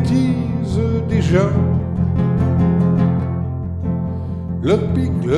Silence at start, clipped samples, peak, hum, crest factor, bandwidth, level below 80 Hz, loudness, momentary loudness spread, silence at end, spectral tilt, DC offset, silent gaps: 0 s; under 0.1%; -2 dBFS; none; 14 dB; 9.4 kHz; -32 dBFS; -18 LUFS; 8 LU; 0 s; -9 dB/octave; under 0.1%; none